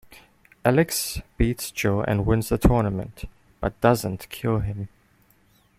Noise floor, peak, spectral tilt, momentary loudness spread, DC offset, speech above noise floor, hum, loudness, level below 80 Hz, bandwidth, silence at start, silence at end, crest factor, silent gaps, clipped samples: -60 dBFS; -2 dBFS; -6 dB/octave; 13 LU; under 0.1%; 38 dB; none; -24 LUFS; -36 dBFS; 16 kHz; 0.1 s; 0.9 s; 22 dB; none; under 0.1%